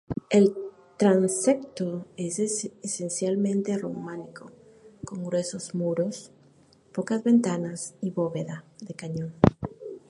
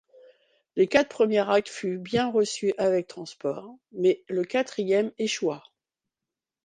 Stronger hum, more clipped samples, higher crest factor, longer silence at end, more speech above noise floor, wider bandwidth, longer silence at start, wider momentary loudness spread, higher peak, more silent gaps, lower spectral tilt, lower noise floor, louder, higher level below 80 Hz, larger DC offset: neither; neither; about the same, 26 dB vs 22 dB; second, 0.1 s vs 1.05 s; second, 32 dB vs 64 dB; first, 11.5 kHz vs 9.8 kHz; second, 0.1 s vs 0.75 s; first, 17 LU vs 11 LU; first, -2 dBFS vs -6 dBFS; neither; first, -6 dB/octave vs -4.5 dB/octave; second, -58 dBFS vs -89 dBFS; about the same, -27 LUFS vs -26 LUFS; first, -54 dBFS vs -68 dBFS; neither